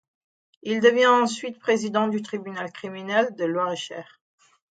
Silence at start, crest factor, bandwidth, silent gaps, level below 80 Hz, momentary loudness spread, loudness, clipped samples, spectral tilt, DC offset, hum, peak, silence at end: 0.65 s; 18 dB; 9.2 kHz; none; -76 dBFS; 16 LU; -23 LUFS; under 0.1%; -4 dB/octave; under 0.1%; none; -6 dBFS; 0.7 s